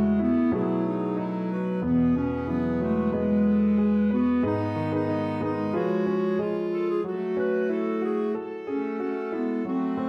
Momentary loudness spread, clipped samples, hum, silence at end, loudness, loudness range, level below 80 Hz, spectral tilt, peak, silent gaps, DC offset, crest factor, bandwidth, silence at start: 6 LU; under 0.1%; none; 0 s; -26 LUFS; 4 LU; -50 dBFS; -10 dB/octave; -14 dBFS; none; under 0.1%; 12 dB; 5.8 kHz; 0 s